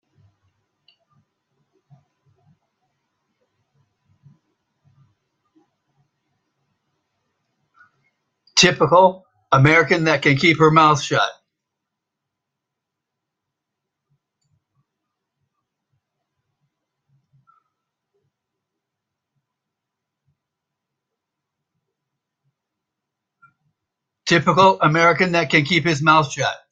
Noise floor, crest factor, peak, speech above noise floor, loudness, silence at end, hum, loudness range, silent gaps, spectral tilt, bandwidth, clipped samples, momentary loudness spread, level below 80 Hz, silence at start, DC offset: -82 dBFS; 22 dB; 0 dBFS; 67 dB; -15 LUFS; 0.15 s; none; 10 LU; none; -4.5 dB/octave; 9.2 kHz; under 0.1%; 7 LU; -60 dBFS; 8.55 s; under 0.1%